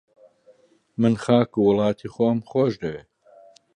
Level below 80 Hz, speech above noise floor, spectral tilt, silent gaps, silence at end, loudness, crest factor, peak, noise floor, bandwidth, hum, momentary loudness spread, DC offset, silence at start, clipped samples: -58 dBFS; 36 dB; -8 dB/octave; none; 0.8 s; -22 LUFS; 20 dB; -4 dBFS; -57 dBFS; 10 kHz; none; 13 LU; under 0.1%; 1 s; under 0.1%